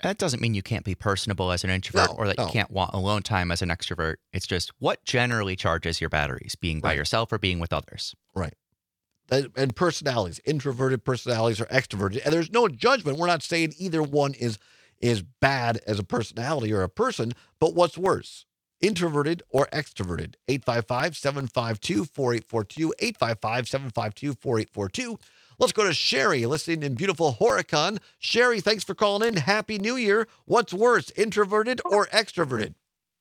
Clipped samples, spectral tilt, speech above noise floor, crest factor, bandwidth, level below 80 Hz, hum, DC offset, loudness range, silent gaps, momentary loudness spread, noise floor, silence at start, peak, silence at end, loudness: under 0.1%; -4.5 dB/octave; 57 dB; 22 dB; 16.5 kHz; -52 dBFS; none; under 0.1%; 4 LU; none; 9 LU; -83 dBFS; 0.05 s; -2 dBFS; 0.5 s; -25 LUFS